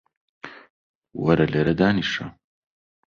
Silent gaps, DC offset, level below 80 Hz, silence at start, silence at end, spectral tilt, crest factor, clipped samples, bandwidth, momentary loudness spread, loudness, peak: 0.70-1.02 s; under 0.1%; -50 dBFS; 0.45 s; 0.8 s; -7 dB/octave; 22 dB; under 0.1%; 7.2 kHz; 22 LU; -21 LUFS; -4 dBFS